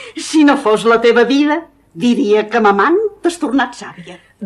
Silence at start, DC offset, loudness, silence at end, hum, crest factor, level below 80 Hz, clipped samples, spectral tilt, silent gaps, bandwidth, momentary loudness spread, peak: 0 s; under 0.1%; -13 LUFS; 0 s; none; 14 dB; -56 dBFS; under 0.1%; -4.5 dB/octave; none; 12 kHz; 9 LU; 0 dBFS